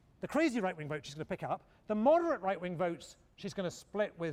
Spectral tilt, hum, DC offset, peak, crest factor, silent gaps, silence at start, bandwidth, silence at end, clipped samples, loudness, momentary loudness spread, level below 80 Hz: -6 dB/octave; none; under 0.1%; -16 dBFS; 18 dB; none; 0.2 s; 14.5 kHz; 0 s; under 0.1%; -35 LUFS; 13 LU; -68 dBFS